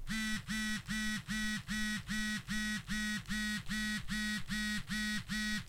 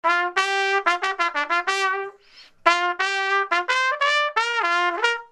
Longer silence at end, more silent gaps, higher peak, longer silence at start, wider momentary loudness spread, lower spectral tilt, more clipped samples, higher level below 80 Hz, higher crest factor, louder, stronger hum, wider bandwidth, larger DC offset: about the same, 0 s vs 0.05 s; neither; second, -24 dBFS vs 0 dBFS; about the same, 0 s vs 0.05 s; second, 0 LU vs 3 LU; first, -2.5 dB/octave vs 0.5 dB/octave; neither; first, -50 dBFS vs -68 dBFS; second, 12 dB vs 22 dB; second, -37 LUFS vs -21 LUFS; neither; first, 16 kHz vs 12.5 kHz; neither